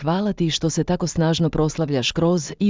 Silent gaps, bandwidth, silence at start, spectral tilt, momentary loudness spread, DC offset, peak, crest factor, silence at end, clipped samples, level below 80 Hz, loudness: none; 7.6 kHz; 0 s; -5.5 dB/octave; 2 LU; under 0.1%; -8 dBFS; 14 dB; 0 s; under 0.1%; -42 dBFS; -21 LUFS